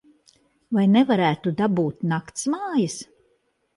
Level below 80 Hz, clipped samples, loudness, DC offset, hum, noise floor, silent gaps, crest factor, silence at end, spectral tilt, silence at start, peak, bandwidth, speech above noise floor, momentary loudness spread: -64 dBFS; under 0.1%; -22 LUFS; under 0.1%; none; -68 dBFS; none; 16 dB; 0.7 s; -6 dB/octave; 0.7 s; -8 dBFS; 11.5 kHz; 47 dB; 9 LU